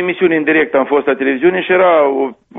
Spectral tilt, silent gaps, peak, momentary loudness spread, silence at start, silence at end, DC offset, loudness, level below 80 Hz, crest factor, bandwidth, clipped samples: -3.5 dB/octave; none; -2 dBFS; 4 LU; 0 s; 0 s; under 0.1%; -13 LUFS; -56 dBFS; 12 dB; 3.9 kHz; under 0.1%